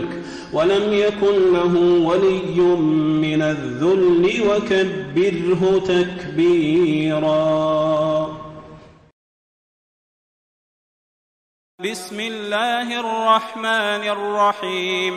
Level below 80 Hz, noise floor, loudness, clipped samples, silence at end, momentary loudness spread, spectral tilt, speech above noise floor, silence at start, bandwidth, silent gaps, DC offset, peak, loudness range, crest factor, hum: -52 dBFS; -43 dBFS; -18 LUFS; under 0.1%; 0 s; 10 LU; -6 dB/octave; 25 dB; 0 s; 12 kHz; 9.12-11.78 s; under 0.1%; -4 dBFS; 11 LU; 16 dB; none